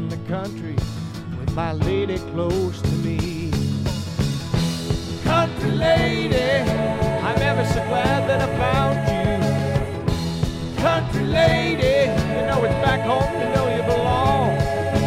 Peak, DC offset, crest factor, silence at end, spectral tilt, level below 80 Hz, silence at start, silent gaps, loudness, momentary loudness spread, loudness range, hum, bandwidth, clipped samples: -6 dBFS; under 0.1%; 16 dB; 0 s; -6.5 dB/octave; -34 dBFS; 0 s; none; -21 LUFS; 7 LU; 4 LU; none; 15.5 kHz; under 0.1%